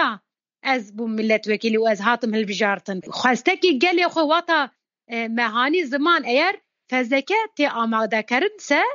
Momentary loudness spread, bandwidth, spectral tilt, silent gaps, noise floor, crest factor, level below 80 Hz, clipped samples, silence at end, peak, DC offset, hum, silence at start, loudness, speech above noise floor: 9 LU; 7.6 kHz; -1.5 dB/octave; none; -48 dBFS; 18 dB; -82 dBFS; under 0.1%; 0 s; -2 dBFS; under 0.1%; none; 0 s; -21 LUFS; 27 dB